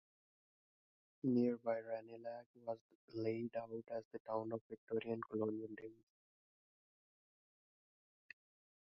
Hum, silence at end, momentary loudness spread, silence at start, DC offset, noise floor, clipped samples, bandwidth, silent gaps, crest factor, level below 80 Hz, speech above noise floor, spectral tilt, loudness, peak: none; 2.9 s; 16 LU; 1.25 s; under 0.1%; under -90 dBFS; under 0.1%; 5.8 kHz; 2.46-2.54 s, 2.81-2.89 s, 2.95-3.08 s, 4.05-4.11 s, 4.20-4.25 s, 4.61-4.70 s, 4.78-4.87 s; 20 dB; -88 dBFS; over 47 dB; -7 dB/octave; -44 LUFS; -26 dBFS